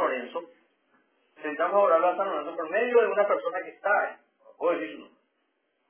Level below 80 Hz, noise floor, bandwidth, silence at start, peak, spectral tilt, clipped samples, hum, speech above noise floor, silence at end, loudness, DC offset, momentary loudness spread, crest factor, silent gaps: under -90 dBFS; -75 dBFS; 3.5 kHz; 0 s; -10 dBFS; -7.5 dB/octave; under 0.1%; none; 49 dB; 0.85 s; -26 LUFS; under 0.1%; 16 LU; 18 dB; none